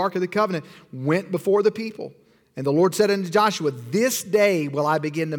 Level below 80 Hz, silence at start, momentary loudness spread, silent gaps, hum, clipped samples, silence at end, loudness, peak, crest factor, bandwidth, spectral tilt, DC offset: -70 dBFS; 0 s; 12 LU; none; none; under 0.1%; 0 s; -22 LUFS; -6 dBFS; 16 dB; 19.5 kHz; -5 dB/octave; under 0.1%